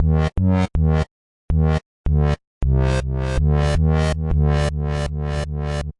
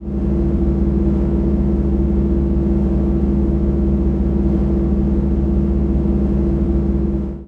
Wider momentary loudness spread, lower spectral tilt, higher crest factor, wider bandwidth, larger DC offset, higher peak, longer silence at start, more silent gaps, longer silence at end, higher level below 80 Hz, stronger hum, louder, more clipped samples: first, 6 LU vs 1 LU; second, -7.5 dB/octave vs -11.5 dB/octave; about the same, 12 dB vs 10 dB; first, 11 kHz vs 3.1 kHz; neither; about the same, -8 dBFS vs -6 dBFS; about the same, 0 s vs 0 s; first, 1.11-1.49 s, 1.86-2.04 s, 2.47-2.61 s vs none; about the same, 0.1 s vs 0 s; about the same, -24 dBFS vs -20 dBFS; neither; second, -21 LUFS vs -18 LUFS; neither